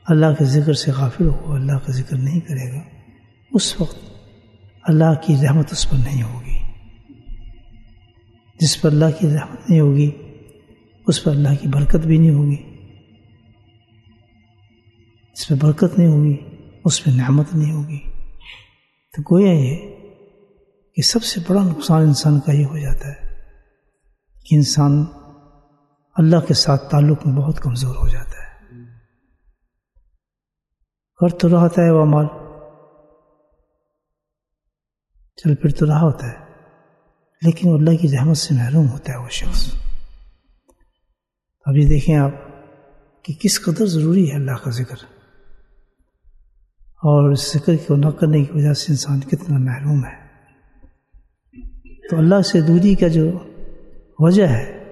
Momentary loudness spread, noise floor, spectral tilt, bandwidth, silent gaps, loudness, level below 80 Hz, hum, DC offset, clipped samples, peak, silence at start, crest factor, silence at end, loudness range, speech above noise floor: 14 LU; -85 dBFS; -6.5 dB/octave; 12.5 kHz; none; -17 LUFS; -32 dBFS; none; under 0.1%; under 0.1%; 0 dBFS; 0.05 s; 18 dB; 0 s; 6 LU; 70 dB